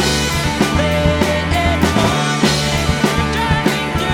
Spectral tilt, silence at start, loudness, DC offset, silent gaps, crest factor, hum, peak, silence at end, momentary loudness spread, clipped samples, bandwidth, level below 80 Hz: -4.5 dB/octave; 0 s; -15 LUFS; under 0.1%; none; 14 dB; none; 0 dBFS; 0 s; 2 LU; under 0.1%; 17.5 kHz; -26 dBFS